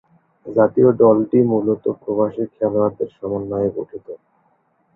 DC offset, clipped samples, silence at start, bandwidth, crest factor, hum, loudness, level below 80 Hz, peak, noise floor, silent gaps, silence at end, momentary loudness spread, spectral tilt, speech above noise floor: under 0.1%; under 0.1%; 0.45 s; 3.2 kHz; 18 dB; none; -18 LUFS; -56 dBFS; -2 dBFS; -62 dBFS; none; 0.8 s; 17 LU; -12.5 dB/octave; 45 dB